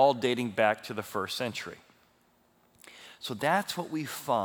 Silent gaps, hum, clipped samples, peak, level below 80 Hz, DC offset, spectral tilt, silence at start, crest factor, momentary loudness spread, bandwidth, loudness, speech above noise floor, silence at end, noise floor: none; none; under 0.1%; -10 dBFS; -78 dBFS; under 0.1%; -4.5 dB/octave; 0 s; 22 dB; 21 LU; over 20 kHz; -31 LUFS; 37 dB; 0 s; -67 dBFS